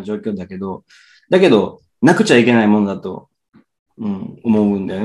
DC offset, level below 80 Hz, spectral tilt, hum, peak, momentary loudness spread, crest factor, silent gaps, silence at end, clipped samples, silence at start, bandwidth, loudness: under 0.1%; -60 dBFS; -6 dB/octave; none; 0 dBFS; 16 LU; 16 dB; 3.79-3.86 s; 0 s; under 0.1%; 0 s; 11.5 kHz; -15 LUFS